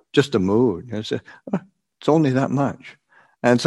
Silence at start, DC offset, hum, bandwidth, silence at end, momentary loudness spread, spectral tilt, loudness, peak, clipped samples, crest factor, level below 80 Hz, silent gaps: 0.15 s; under 0.1%; none; 11.5 kHz; 0 s; 11 LU; -6.5 dB/octave; -21 LUFS; 0 dBFS; under 0.1%; 20 dB; -60 dBFS; none